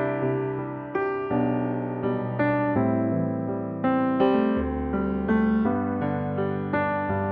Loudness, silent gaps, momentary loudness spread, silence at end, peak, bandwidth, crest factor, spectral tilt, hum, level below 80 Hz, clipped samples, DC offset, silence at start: -25 LUFS; none; 6 LU; 0 s; -10 dBFS; 4.8 kHz; 16 dB; -11 dB/octave; none; -46 dBFS; under 0.1%; under 0.1%; 0 s